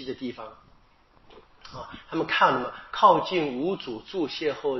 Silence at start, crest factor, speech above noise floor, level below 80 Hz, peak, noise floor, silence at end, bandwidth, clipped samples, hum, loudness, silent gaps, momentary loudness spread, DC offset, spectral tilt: 0 s; 22 dB; 33 dB; -60 dBFS; -4 dBFS; -59 dBFS; 0 s; 6 kHz; under 0.1%; none; -25 LUFS; none; 22 LU; under 0.1%; -2.5 dB/octave